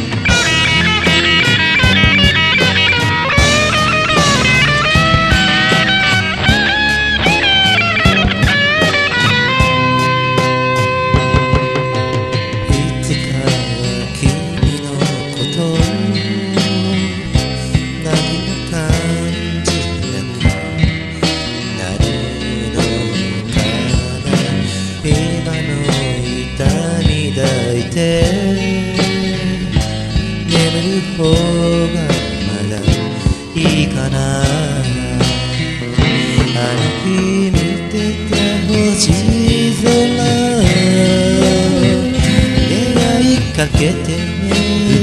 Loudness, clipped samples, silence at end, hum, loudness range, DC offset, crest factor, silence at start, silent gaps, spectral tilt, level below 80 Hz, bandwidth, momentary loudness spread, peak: -13 LUFS; under 0.1%; 0 s; none; 7 LU; 0.3%; 14 dB; 0 s; none; -4.5 dB/octave; -26 dBFS; 13.5 kHz; 8 LU; 0 dBFS